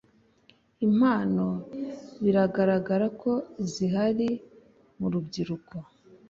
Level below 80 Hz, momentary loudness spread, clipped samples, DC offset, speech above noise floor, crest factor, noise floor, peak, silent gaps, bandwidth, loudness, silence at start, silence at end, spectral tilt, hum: -64 dBFS; 14 LU; under 0.1%; under 0.1%; 36 dB; 16 dB; -62 dBFS; -12 dBFS; none; 7.6 kHz; -27 LUFS; 0.8 s; 0.45 s; -7.5 dB/octave; none